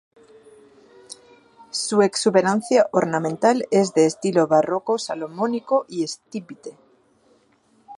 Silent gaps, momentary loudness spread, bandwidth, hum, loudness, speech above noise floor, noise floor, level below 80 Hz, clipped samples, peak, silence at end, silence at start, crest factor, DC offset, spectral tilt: none; 21 LU; 11.5 kHz; none; -20 LUFS; 40 dB; -60 dBFS; -72 dBFS; under 0.1%; -4 dBFS; 0.05 s; 1.1 s; 20 dB; under 0.1%; -4.5 dB/octave